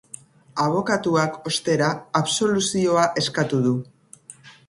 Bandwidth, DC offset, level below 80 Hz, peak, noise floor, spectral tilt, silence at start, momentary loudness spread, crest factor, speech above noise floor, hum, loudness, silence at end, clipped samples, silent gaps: 11.5 kHz; under 0.1%; -60 dBFS; -4 dBFS; -47 dBFS; -4.5 dB/octave; 0.55 s; 10 LU; 18 dB; 26 dB; none; -22 LUFS; 0.15 s; under 0.1%; none